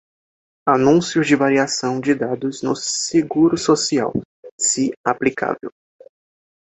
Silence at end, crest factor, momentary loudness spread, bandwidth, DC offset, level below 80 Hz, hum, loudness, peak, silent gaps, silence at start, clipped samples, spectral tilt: 0.95 s; 18 dB; 9 LU; 8.4 kHz; under 0.1%; -58 dBFS; none; -18 LUFS; -2 dBFS; 4.25-4.43 s, 4.51-4.58 s, 4.97-5.04 s; 0.65 s; under 0.1%; -4 dB/octave